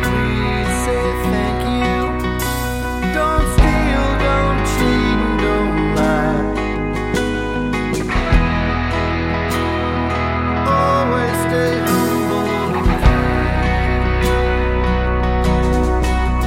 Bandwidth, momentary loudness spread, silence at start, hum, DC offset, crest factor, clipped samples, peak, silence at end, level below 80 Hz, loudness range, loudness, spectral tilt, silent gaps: 16.5 kHz; 5 LU; 0 s; none; under 0.1%; 16 dB; under 0.1%; 0 dBFS; 0 s; -22 dBFS; 2 LU; -17 LUFS; -6 dB/octave; none